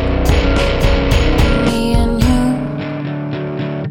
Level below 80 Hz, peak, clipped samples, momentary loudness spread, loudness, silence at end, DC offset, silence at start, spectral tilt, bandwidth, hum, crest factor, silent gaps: -18 dBFS; 0 dBFS; under 0.1%; 8 LU; -16 LUFS; 0 s; under 0.1%; 0 s; -6.5 dB/octave; 18 kHz; none; 14 dB; none